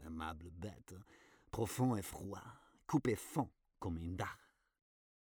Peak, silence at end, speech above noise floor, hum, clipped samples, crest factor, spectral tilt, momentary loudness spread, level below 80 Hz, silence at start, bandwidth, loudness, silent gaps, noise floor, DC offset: -22 dBFS; 0.95 s; 27 dB; none; under 0.1%; 22 dB; -6 dB/octave; 20 LU; -62 dBFS; 0 s; over 20 kHz; -42 LUFS; none; -67 dBFS; under 0.1%